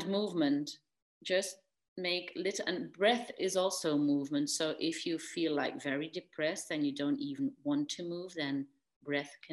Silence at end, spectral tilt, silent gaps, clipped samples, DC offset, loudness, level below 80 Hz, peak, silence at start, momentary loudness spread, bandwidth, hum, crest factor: 0 s; -3.5 dB/octave; 1.02-1.21 s, 1.88-1.96 s, 8.96-9.01 s; under 0.1%; under 0.1%; -35 LUFS; -84 dBFS; -16 dBFS; 0 s; 9 LU; 12.5 kHz; none; 18 dB